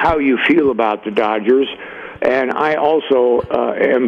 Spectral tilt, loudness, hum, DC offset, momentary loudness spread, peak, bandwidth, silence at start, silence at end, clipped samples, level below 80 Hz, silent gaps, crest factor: -7 dB/octave; -15 LUFS; none; under 0.1%; 6 LU; -2 dBFS; 6.8 kHz; 0 s; 0 s; under 0.1%; -44 dBFS; none; 12 dB